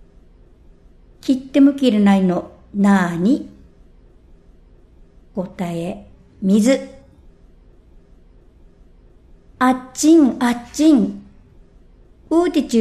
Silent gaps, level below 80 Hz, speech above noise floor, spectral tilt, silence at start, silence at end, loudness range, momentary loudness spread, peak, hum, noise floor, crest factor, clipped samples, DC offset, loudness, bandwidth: none; -48 dBFS; 32 dB; -6 dB/octave; 1.25 s; 0 s; 8 LU; 15 LU; -2 dBFS; none; -47 dBFS; 16 dB; under 0.1%; under 0.1%; -17 LUFS; 14 kHz